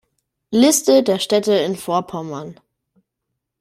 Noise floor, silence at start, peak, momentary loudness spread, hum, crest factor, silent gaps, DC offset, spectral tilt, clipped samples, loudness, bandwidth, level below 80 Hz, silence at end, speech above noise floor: -78 dBFS; 0.5 s; -2 dBFS; 16 LU; none; 16 dB; none; under 0.1%; -4 dB/octave; under 0.1%; -17 LUFS; 16 kHz; -62 dBFS; 1.05 s; 62 dB